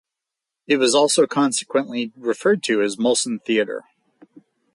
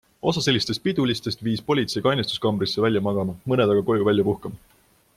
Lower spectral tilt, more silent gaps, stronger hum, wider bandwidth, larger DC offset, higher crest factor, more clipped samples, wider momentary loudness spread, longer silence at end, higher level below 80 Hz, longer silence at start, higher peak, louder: second, -3 dB/octave vs -5.5 dB/octave; neither; neither; second, 11.5 kHz vs 15 kHz; neither; about the same, 16 dB vs 18 dB; neither; first, 10 LU vs 6 LU; first, 0.95 s vs 0.6 s; second, -70 dBFS vs -56 dBFS; first, 0.7 s vs 0.25 s; about the same, -4 dBFS vs -6 dBFS; first, -20 LUFS vs -23 LUFS